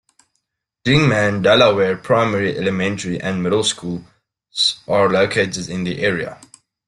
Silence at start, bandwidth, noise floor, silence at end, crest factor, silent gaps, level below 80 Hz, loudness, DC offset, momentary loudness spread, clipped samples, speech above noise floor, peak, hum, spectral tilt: 0.85 s; 11.5 kHz; -73 dBFS; 0.5 s; 16 dB; none; -52 dBFS; -17 LUFS; under 0.1%; 12 LU; under 0.1%; 56 dB; -2 dBFS; none; -4.5 dB/octave